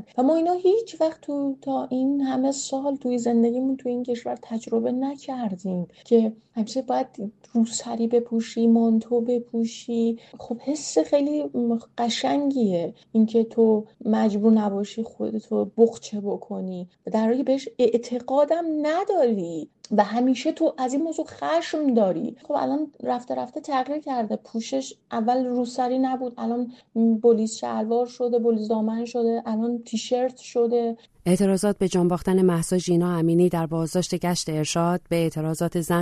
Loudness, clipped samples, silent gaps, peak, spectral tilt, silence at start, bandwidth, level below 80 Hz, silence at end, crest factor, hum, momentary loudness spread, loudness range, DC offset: -24 LUFS; under 0.1%; none; -6 dBFS; -6 dB/octave; 0 s; 13.5 kHz; -60 dBFS; 0 s; 18 dB; none; 9 LU; 4 LU; under 0.1%